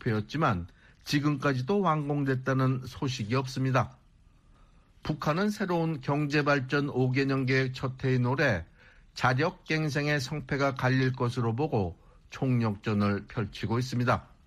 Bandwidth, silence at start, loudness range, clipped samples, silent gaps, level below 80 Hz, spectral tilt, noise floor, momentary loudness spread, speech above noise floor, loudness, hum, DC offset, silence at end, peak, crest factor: 13 kHz; 0.05 s; 3 LU; under 0.1%; none; -56 dBFS; -6.5 dB/octave; -59 dBFS; 7 LU; 31 dB; -29 LUFS; none; under 0.1%; 0.2 s; -10 dBFS; 18 dB